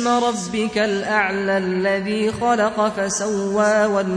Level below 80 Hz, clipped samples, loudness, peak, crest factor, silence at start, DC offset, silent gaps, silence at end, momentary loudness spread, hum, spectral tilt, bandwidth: -54 dBFS; under 0.1%; -20 LUFS; -4 dBFS; 14 dB; 0 s; under 0.1%; none; 0 s; 4 LU; none; -4 dB/octave; 11 kHz